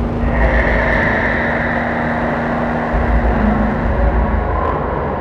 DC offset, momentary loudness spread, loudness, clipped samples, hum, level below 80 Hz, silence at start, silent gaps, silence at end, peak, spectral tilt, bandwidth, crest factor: under 0.1%; 4 LU; -16 LUFS; under 0.1%; none; -20 dBFS; 0 s; none; 0 s; 0 dBFS; -8.5 dB/octave; 6.2 kHz; 14 dB